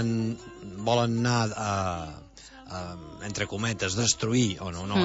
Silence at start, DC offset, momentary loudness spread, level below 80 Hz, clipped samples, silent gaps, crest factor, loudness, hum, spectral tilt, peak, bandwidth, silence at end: 0 s; under 0.1%; 16 LU; -54 dBFS; under 0.1%; none; 18 dB; -28 LUFS; none; -4.5 dB/octave; -10 dBFS; 8.2 kHz; 0 s